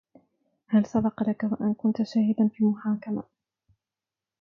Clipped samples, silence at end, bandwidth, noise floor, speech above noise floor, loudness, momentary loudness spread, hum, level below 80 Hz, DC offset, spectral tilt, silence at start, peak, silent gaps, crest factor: under 0.1%; 1.2 s; 6.6 kHz; under -90 dBFS; over 65 dB; -26 LUFS; 6 LU; none; -64 dBFS; under 0.1%; -8.5 dB/octave; 0.7 s; -12 dBFS; none; 16 dB